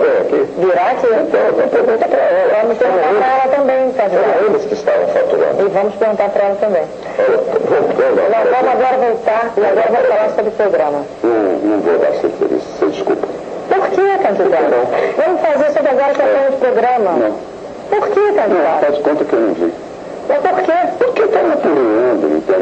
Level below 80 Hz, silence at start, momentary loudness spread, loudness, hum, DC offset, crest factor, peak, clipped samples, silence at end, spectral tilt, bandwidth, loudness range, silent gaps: -54 dBFS; 0 s; 5 LU; -13 LUFS; none; under 0.1%; 12 dB; -2 dBFS; under 0.1%; 0 s; -6 dB/octave; 8.4 kHz; 2 LU; none